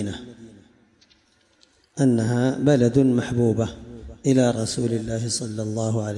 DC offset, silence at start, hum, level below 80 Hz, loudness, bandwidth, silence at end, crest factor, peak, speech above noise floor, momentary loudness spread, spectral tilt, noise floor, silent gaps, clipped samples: under 0.1%; 0 s; none; -50 dBFS; -22 LUFS; 11.5 kHz; 0 s; 16 dB; -6 dBFS; 41 dB; 17 LU; -6 dB/octave; -61 dBFS; none; under 0.1%